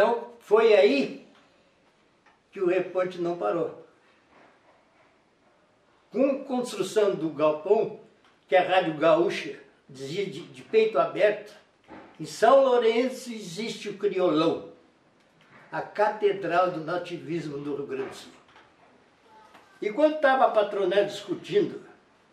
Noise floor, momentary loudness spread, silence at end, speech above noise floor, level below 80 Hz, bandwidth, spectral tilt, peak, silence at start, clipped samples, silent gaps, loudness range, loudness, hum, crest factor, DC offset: -63 dBFS; 15 LU; 0.5 s; 39 dB; -78 dBFS; 13 kHz; -5 dB/octave; -6 dBFS; 0 s; under 0.1%; none; 7 LU; -25 LUFS; none; 20 dB; under 0.1%